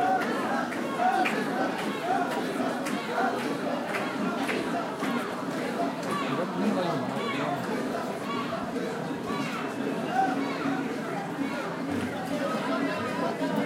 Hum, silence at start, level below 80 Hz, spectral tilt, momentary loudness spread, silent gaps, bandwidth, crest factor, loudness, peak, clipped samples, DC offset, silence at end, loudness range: none; 0 s; -70 dBFS; -5 dB/octave; 5 LU; none; 16 kHz; 16 dB; -29 LUFS; -12 dBFS; under 0.1%; under 0.1%; 0 s; 2 LU